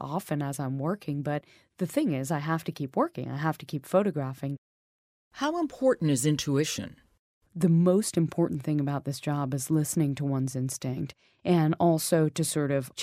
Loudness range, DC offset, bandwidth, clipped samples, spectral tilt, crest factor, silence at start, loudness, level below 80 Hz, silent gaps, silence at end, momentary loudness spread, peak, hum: 4 LU; under 0.1%; 16 kHz; under 0.1%; -6 dB/octave; 18 dB; 0 s; -28 LUFS; -64 dBFS; 4.58-5.31 s, 7.19-7.41 s; 0 s; 10 LU; -10 dBFS; none